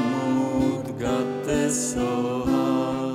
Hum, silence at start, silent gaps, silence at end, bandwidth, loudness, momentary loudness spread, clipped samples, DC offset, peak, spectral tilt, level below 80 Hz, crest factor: none; 0 s; none; 0 s; 15 kHz; -24 LUFS; 3 LU; under 0.1%; under 0.1%; -12 dBFS; -5 dB/octave; -46 dBFS; 12 dB